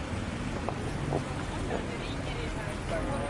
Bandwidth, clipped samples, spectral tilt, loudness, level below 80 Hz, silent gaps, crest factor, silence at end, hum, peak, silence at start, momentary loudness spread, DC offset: 11.5 kHz; under 0.1%; -5.5 dB/octave; -34 LUFS; -42 dBFS; none; 20 dB; 0 s; none; -12 dBFS; 0 s; 2 LU; under 0.1%